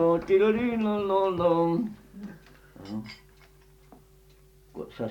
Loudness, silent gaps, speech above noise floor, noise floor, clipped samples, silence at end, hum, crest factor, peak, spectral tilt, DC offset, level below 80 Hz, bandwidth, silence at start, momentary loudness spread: -26 LUFS; none; 31 dB; -56 dBFS; under 0.1%; 0 s; none; 16 dB; -12 dBFS; -8 dB/octave; under 0.1%; -56 dBFS; 18.5 kHz; 0 s; 22 LU